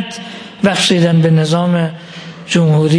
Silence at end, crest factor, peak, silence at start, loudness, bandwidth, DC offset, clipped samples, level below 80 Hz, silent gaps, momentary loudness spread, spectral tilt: 0 s; 12 dB; 0 dBFS; 0 s; -13 LUFS; 10.5 kHz; under 0.1%; under 0.1%; -54 dBFS; none; 19 LU; -5.5 dB/octave